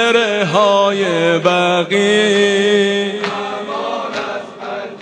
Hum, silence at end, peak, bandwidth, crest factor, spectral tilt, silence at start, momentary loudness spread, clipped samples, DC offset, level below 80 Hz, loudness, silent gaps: none; 0 s; 0 dBFS; 10 kHz; 14 dB; -4 dB/octave; 0 s; 11 LU; under 0.1%; under 0.1%; -62 dBFS; -14 LUFS; none